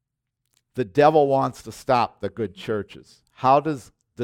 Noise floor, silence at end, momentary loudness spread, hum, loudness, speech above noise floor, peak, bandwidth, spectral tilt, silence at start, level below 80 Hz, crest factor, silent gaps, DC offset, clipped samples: -80 dBFS; 0 s; 17 LU; none; -22 LUFS; 58 dB; -4 dBFS; 15.5 kHz; -6.5 dB/octave; 0.75 s; -60 dBFS; 20 dB; none; under 0.1%; under 0.1%